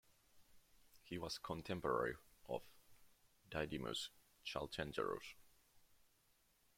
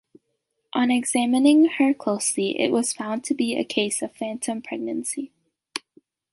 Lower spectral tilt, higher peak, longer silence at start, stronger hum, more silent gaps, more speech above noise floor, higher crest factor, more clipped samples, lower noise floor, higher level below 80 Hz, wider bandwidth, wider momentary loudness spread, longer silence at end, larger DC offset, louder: first, -4.5 dB/octave vs -3 dB/octave; second, -26 dBFS vs -6 dBFS; second, 0.35 s vs 0.75 s; neither; neither; second, 32 dB vs 54 dB; about the same, 22 dB vs 18 dB; neither; about the same, -77 dBFS vs -76 dBFS; about the same, -70 dBFS vs -70 dBFS; first, 16.5 kHz vs 11.5 kHz; second, 11 LU vs 15 LU; first, 0.95 s vs 0.55 s; neither; second, -46 LUFS vs -23 LUFS